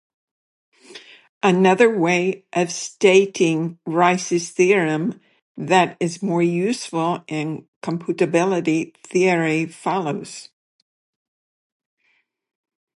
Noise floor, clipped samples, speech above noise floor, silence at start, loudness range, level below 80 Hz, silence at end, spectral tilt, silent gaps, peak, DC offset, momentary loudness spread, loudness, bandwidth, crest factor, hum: -67 dBFS; under 0.1%; 47 dB; 0.9 s; 6 LU; -72 dBFS; 2.55 s; -5 dB/octave; 1.29-1.41 s, 5.42-5.55 s, 7.68-7.81 s; -2 dBFS; under 0.1%; 12 LU; -20 LUFS; 11.5 kHz; 20 dB; none